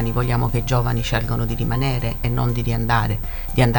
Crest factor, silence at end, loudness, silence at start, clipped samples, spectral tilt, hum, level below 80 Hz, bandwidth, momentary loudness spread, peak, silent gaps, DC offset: 16 dB; 0 s; -21 LUFS; 0 s; under 0.1%; -6.5 dB/octave; none; -28 dBFS; 19.5 kHz; 3 LU; -4 dBFS; none; under 0.1%